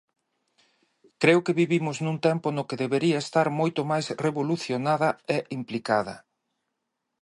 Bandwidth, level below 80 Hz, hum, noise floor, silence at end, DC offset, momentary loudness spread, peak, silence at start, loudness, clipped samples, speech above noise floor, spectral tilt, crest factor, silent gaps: 11.5 kHz; -72 dBFS; none; -81 dBFS; 1 s; under 0.1%; 8 LU; -6 dBFS; 1.2 s; -25 LUFS; under 0.1%; 56 dB; -6 dB/octave; 22 dB; none